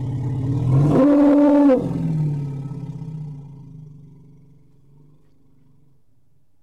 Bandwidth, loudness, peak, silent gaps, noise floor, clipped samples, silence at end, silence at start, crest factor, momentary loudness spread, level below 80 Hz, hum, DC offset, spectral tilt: 5.8 kHz; -17 LUFS; -8 dBFS; none; -64 dBFS; under 0.1%; 2.65 s; 0 s; 12 dB; 22 LU; -46 dBFS; none; 0.3%; -10 dB/octave